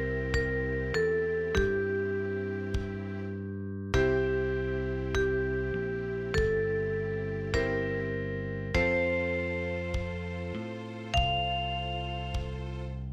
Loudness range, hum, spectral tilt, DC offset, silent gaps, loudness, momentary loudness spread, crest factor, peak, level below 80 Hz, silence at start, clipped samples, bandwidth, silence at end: 2 LU; none; -6.5 dB/octave; under 0.1%; none; -31 LUFS; 9 LU; 16 dB; -14 dBFS; -40 dBFS; 0 s; under 0.1%; 10.5 kHz; 0 s